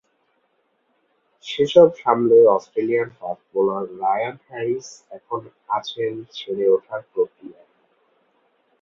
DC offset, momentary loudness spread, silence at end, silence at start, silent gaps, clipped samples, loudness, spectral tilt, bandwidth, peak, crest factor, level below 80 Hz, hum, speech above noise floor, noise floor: under 0.1%; 17 LU; 1.3 s; 1.45 s; none; under 0.1%; -20 LUFS; -6 dB/octave; 7.4 kHz; -2 dBFS; 20 dB; -66 dBFS; none; 48 dB; -68 dBFS